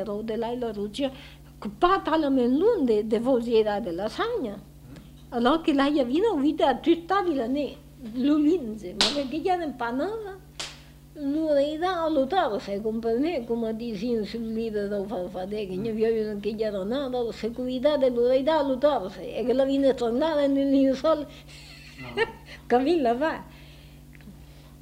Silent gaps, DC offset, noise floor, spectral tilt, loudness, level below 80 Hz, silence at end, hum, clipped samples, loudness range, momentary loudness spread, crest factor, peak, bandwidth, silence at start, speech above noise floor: none; under 0.1%; -47 dBFS; -5 dB/octave; -25 LUFS; -50 dBFS; 0.05 s; none; under 0.1%; 5 LU; 13 LU; 20 dB; -6 dBFS; 16 kHz; 0 s; 22 dB